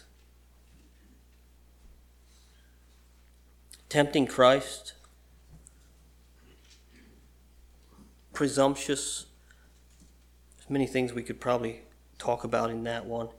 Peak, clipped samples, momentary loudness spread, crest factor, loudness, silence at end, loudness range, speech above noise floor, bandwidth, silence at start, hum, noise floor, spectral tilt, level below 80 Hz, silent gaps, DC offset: -8 dBFS; under 0.1%; 17 LU; 26 dB; -28 LUFS; 0.05 s; 6 LU; 31 dB; 17.5 kHz; 3.9 s; 60 Hz at -60 dBFS; -58 dBFS; -4.5 dB/octave; -58 dBFS; none; under 0.1%